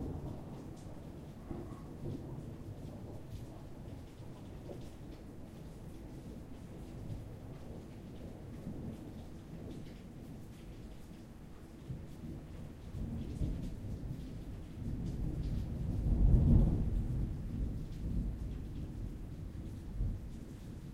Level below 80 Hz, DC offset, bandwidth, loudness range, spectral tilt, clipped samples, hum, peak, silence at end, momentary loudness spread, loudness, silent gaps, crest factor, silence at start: -42 dBFS; under 0.1%; 12.5 kHz; 15 LU; -8.5 dB/octave; under 0.1%; none; -16 dBFS; 0 s; 13 LU; -42 LUFS; none; 24 dB; 0 s